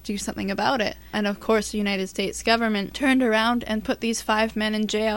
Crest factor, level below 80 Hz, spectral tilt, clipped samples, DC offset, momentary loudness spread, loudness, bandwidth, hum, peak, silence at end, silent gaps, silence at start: 20 dB; -48 dBFS; -4 dB/octave; under 0.1%; 0.2%; 6 LU; -24 LUFS; 17 kHz; none; -4 dBFS; 0 s; none; 0.05 s